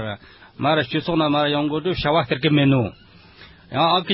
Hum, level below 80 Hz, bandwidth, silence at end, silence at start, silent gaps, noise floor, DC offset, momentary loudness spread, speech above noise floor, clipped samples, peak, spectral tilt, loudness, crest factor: none; -46 dBFS; 5.8 kHz; 0 s; 0 s; none; -46 dBFS; under 0.1%; 11 LU; 26 dB; under 0.1%; -6 dBFS; -11 dB/octave; -20 LUFS; 14 dB